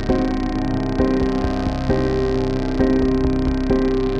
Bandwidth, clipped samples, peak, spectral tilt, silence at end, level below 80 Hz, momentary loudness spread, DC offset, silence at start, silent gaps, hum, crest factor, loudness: 8 kHz; under 0.1%; -4 dBFS; -8 dB/octave; 0 s; -26 dBFS; 4 LU; under 0.1%; 0 s; none; none; 14 dB; -20 LUFS